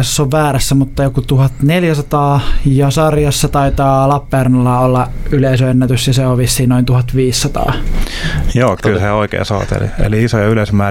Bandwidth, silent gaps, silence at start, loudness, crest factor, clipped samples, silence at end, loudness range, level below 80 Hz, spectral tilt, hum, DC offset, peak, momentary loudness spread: 16.5 kHz; none; 0 s; -13 LUFS; 12 dB; under 0.1%; 0 s; 2 LU; -22 dBFS; -6 dB/octave; none; under 0.1%; 0 dBFS; 5 LU